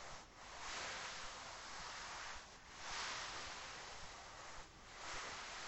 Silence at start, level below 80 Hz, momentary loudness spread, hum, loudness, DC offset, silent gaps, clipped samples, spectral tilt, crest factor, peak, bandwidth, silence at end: 0 s; -66 dBFS; 10 LU; none; -49 LUFS; under 0.1%; none; under 0.1%; -1 dB/octave; 16 dB; -34 dBFS; 16 kHz; 0 s